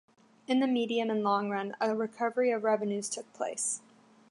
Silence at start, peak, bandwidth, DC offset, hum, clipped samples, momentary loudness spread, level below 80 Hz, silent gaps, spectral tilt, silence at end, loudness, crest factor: 0.5 s; -14 dBFS; 11.5 kHz; under 0.1%; none; under 0.1%; 7 LU; -86 dBFS; none; -3.5 dB/octave; 0.5 s; -31 LUFS; 16 dB